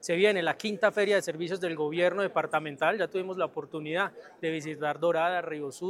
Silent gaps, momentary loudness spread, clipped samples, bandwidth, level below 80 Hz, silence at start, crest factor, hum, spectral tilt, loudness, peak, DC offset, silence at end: none; 8 LU; under 0.1%; 14 kHz; -80 dBFS; 0 s; 20 dB; none; -4.5 dB/octave; -29 LUFS; -10 dBFS; under 0.1%; 0 s